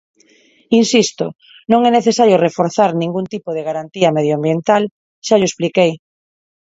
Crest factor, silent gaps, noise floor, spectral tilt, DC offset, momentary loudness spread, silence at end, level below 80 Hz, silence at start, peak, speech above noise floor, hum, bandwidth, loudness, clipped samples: 16 dB; 4.91-5.22 s; -52 dBFS; -5 dB/octave; under 0.1%; 12 LU; 0.7 s; -60 dBFS; 0.7 s; 0 dBFS; 37 dB; none; 8 kHz; -15 LUFS; under 0.1%